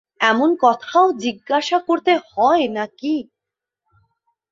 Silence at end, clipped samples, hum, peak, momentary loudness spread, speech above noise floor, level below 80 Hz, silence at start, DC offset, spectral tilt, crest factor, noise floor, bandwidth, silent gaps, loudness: 1.3 s; under 0.1%; none; -2 dBFS; 8 LU; 68 dB; -66 dBFS; 0.2 s; under 0.1%; -4 dB/octave; 18 dB; -85 dBFS; 7.6 kHz; none; -18 LUFS